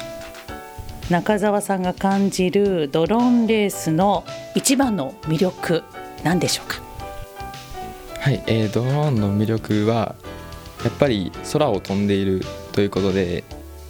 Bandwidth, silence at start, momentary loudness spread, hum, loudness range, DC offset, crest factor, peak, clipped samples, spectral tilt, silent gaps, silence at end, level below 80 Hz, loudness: over 20 kHz; 0 s; 16 LU; none; 5 LU; under 0.1%; 20 dB; -2 dBFS; under 0.1%; -5.5 dB/octave; none; 0 s; -44 dBFS; -21 LUFS